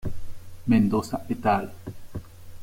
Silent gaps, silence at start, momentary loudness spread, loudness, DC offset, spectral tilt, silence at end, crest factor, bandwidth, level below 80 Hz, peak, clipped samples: none; 0 s; 20 LU; -25 LUFS; under 0.1%; -7.5 dB/octave; 0 s; 16 dB; 16.5 kHz; -44 dBFS; -10 dBFS; under 0.1%